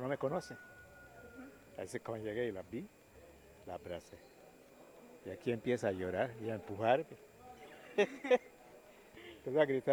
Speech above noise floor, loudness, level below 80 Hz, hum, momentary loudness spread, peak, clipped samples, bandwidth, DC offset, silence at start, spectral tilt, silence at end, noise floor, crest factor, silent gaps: 23 dB; -38 LUFS; -72 dBFS; none; 25 LU; -16 dBFS; under 0.1%; over 20 kHz; under 0.1%; 0 s; -6 dB/octave; 0 s; -60 dBFS; 24 dB; none